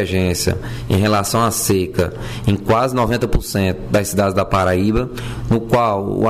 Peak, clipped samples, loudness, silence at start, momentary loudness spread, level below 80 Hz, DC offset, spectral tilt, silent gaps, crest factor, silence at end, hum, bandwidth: -6 dBFS; under 0.1%; -18 LUFS; 0 s; 5 LU; -30 dBFS; 0.4%; -5.5 dB/octave; none; 10 dB; 0 s; none; 16 kHz